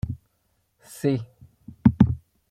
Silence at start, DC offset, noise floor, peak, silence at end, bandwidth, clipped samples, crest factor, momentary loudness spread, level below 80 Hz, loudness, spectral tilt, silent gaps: 0.05 s; under 0.1%; -70 dBFS; -2 dBFS; 0.35 s; 14.5 kHz; under 0.1%; 22 dB; 23 LU; -44 dBFS; -24 LUFS; -8.5 dB/octave; none